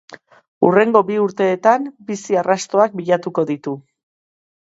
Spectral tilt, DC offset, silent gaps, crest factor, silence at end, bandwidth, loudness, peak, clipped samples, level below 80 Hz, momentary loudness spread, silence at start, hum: -5.5 dB/octave; under 0.1%; 0.48-0.61 s; 18 dB; 0.9 s; 8 kHz; -17 LUFS; 0 dBFS; under 0.1%; -68 dBFS; 12 LU; 0.1 s; none